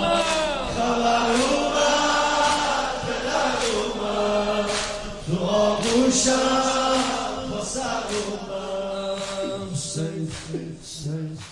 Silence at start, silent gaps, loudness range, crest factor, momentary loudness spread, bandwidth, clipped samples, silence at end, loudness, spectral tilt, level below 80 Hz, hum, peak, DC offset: 0 s; none; 7 LU; 16 dB; 11 LU; 11.5 kHz; under 0.1%; 0 s; -23 LUFS; -3.5 dB/octave; -44 dBFS; none; -8 dBFS; under 0.1%